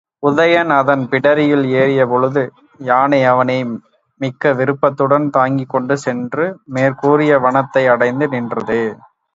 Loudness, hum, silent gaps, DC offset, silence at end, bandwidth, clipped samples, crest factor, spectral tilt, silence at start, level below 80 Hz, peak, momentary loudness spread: -15 LUFS; none; none; under 0.1%; 0.4 s; 7.8 kHz; under 0.1%; 14 dB; -7 dB/octave; 0.2 s; -60 dBFS; 0 dBFS; 8 LU